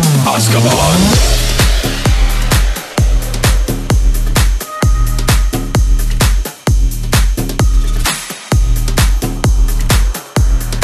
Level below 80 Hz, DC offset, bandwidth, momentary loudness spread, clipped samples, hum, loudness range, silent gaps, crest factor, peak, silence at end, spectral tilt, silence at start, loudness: -12 dBFS; under 0.1%; 14 kHz; 6 LU; under 0.1%; none; 3 LU; none; 10 dB; 0 dBFS; 0 s; -4.5 dB/octave; 0 s; -13 LUFS